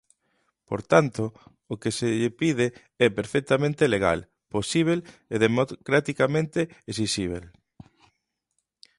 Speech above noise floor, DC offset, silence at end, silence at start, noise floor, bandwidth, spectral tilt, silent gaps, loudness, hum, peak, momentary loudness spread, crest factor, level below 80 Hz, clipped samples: 54 dB; under 0.1%; 1.55 s; 0.7 s; -78 dBFS; 11.5 kHz; -5.5 dB/octave; none; -25 LUFS; none; -4 dBFS; 11 LU; 22 dB; -54 dBFS; under 0.1%